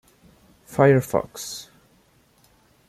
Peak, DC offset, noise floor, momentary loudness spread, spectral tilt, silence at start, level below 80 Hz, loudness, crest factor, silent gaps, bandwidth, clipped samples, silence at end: -4 dBFS; under 0.1%; -59 dBFS; 16 LU; -6 dB/octave; 0.7 s; -58 dBFS; -22 LUFS; 22 dB; none; 15 kHz; under 0.1%; 1.25 s